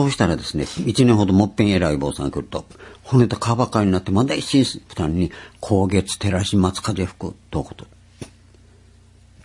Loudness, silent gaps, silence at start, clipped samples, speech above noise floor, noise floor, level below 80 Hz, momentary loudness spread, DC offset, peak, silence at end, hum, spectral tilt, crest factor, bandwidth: -20 LUFS; none; 0 s; under 0.1%; 30 dB; -49 dBFS; -44 dBFS; 15 LU; under 0.1%; 0 dBFS; 1.2 s; none; -6 dB/octave; 20 dB; 11.5 kHz